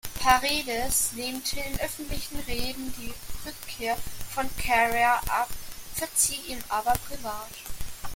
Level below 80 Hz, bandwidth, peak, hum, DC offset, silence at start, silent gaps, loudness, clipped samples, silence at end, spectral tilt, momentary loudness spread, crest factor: -42 dBFS; 17 kHz; -4 dBFS; none; under 0.1%; 0.05 s; none; -27 LUFS; under 0.1%; 0 s; -1.5 dB/octave; 16 LU; 24 dB